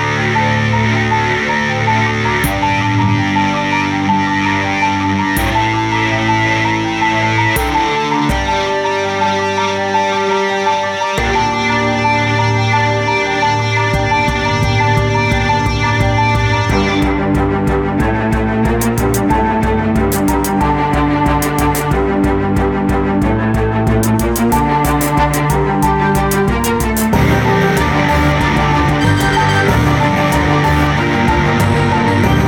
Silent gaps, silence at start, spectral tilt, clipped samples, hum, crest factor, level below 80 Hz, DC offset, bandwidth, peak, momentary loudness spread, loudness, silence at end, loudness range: none; 0 s; -5.5 dB/octave; under 0.1%; none; 12 dB; -26 dBFS; under 0.1%; 19 kHz; 0 dBFS; 2 LU; -14 LUFS; 0 s; 2 LU